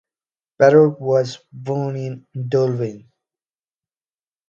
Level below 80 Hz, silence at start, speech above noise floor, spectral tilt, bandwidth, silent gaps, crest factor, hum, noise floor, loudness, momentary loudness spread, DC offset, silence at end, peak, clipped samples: -66 dBFS; 0.6 s; over 72 dB; -7.5 dB/octave; 7.4 kHz; none; 20 dB; none; under -90 dBFS; -18 LUFS; 16 LU; under 0.1%; 1.5 s; 0 dBFS; under 0.1%